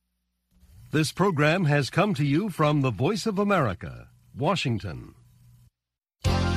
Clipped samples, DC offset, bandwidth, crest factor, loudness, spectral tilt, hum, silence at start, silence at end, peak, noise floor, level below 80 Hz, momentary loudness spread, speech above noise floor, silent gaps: under 0.1%; under 0.1%; 14.5 kHz; 18 dB; -25 LUFS; -6 dB/octave; none; 0.8 s; 0 s; -8 dBFS; -87 dBFS; -46 dBFS; 9 LU; 63 dB; none